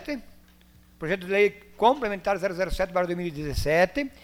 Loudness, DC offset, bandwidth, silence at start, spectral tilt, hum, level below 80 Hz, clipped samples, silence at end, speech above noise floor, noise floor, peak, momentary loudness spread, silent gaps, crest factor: -26 LUFS; under 0.1%; 16.5 kHz; 0 s; -5.5 dB/octave; none; -42 dBFS; under 0.1%; 0.15 s; 30 dB; -55 dBFS; -6 dBFS; 8 LU; none; 20 dB